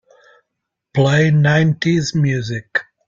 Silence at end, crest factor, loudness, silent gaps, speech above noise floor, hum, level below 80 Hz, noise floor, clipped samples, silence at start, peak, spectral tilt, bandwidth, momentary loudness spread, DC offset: 0.25 s; 14 dB; -16 LUFS; none; 63 dB; none; -50 dBFS; -78 dBFS; under 0.1%; 0.95 s; -2 dBFS; -6.5 dB/octave; 7.6 kHz; 9 LU; under 0.1%